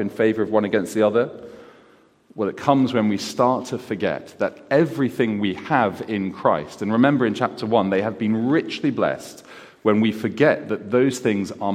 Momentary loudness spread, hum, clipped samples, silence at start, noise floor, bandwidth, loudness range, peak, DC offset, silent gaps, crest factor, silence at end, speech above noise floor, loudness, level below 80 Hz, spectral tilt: 8 LU; none; under 0.1%; 0 s; -54 dBFS; 15.5 kHz; 1 LU; -2 dBFS; under 0.1%; none; 20 dB; 0 s; 33 dB; -21 LUFS; -64 dBFS; -6.5 dB/octave